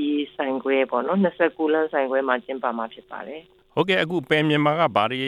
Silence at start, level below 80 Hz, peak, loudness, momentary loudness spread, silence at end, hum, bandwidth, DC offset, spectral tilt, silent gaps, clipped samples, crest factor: 0 s; -66 dBFS; -4 dBFS; -22 LUFS; 14 LU; 0 s; none; 11.5 kHz; under 0.1%; -7 dB/octave; none; under 0.1%; 18 dB